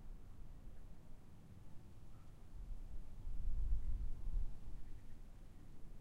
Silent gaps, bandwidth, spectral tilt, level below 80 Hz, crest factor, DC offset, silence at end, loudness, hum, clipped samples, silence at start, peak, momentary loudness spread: none; 2.9 kHz; -7.5 dB/octave; -46 dBFS; 14 dB; under 0.1%; 0 s; -53 LUFS; none; under 0.1%; 0 s; -28 dBFS; 16 LU